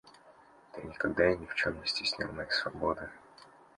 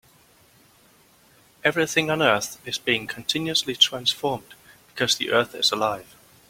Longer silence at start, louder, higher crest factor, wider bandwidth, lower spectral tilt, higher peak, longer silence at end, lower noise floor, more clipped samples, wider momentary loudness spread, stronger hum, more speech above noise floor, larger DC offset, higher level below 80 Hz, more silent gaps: second, 0.05 s vs 1.65 s; second, -32 LUFS vs -22 LUFS; about the same, 22 dB vs 24 dB; second, 11.5 kHz vs 16.5 kHz; first, -4 dB/octave vs -2.5 dB/octave; second, -12 dBFS vs -2 dBFS; second, 0.3 s vs 0.45 s; about the same, -59 dBFS vs -57 dBFS; neither; first, 18 LU vs 10 LU; neither; second, 26 dB vs 33 dB; neither; about the same, -58 dBFS vs -62 dBFS; neither